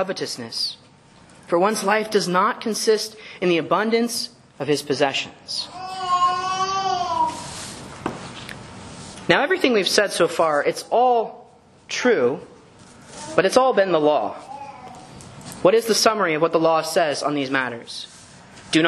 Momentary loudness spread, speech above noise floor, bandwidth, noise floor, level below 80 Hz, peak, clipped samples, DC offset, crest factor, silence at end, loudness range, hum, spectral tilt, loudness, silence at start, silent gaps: 18 LU; 29 dB; 13 kHz; -50 dBFS; -60 dBFS; 0 dBFS; under 0.1%; under 0.1%; 22 dB; 0 s; 4 LU; none; -3.5 dB/octave; -21 LUFS; 0 s; none